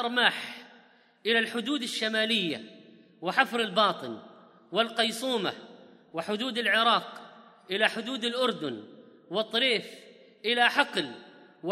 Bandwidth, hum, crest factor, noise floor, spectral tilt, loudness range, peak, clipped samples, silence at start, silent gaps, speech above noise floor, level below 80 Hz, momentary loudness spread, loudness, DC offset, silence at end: 15.5 kHz; none; 24 dB; -59 dBFS; -3 dB/octave; 2 LU; -6 dBFS; under 0.1%; 0 s; none; 31 dB; -86 dBFS; 16 LU; -27 LUFS; under 0.1%; 0 s